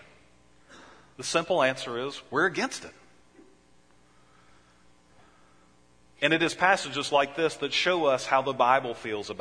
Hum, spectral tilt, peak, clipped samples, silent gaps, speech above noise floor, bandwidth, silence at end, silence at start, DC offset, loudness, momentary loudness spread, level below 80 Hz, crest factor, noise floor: none; -3 dB/octave; -6 dBFS; under 0.1%; none; 35 dB; 10.5 kHz; 0 s; 0.7 s; under 0.1%; -26 LUFS; 10 LU; -68 dBFS; 22 dB; -62 dBFS